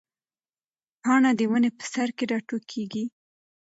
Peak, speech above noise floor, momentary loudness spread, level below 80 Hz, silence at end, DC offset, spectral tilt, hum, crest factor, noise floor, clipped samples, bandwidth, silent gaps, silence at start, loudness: -8 dBFS; over 66 dB; 12 LU; -76 dBFS; 0.55 s; under 0.1%; -4.5 dB/octave; none; 18 dB; under -90 dBFS; under 0.1%; 8 kHz; none; 1.05 s; -25 LUFS